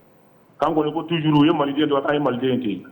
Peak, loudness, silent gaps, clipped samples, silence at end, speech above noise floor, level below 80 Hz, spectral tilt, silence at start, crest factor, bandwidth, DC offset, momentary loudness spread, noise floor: -6 dBFS; -20 LUFS; none; under 0.1%; 0 s; 34 dB; -58 dBFS; -8.5 dB/octave; 0.6 s; 14 dB; 19 kHz; under 0.1%; 6 LU; -53 dBFS